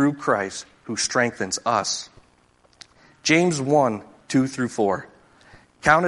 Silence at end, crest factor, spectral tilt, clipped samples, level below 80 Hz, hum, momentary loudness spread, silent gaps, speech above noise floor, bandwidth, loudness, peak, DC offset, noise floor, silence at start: 0 s; 22 dB; -4 dB/octave; under 0.1%; -56 dBFS; none; 12 LU; none; 37 dB; 11.5 kHz; -22 LUFS; -2 dBFS; under 0.1%; -59 dBFS; 0 s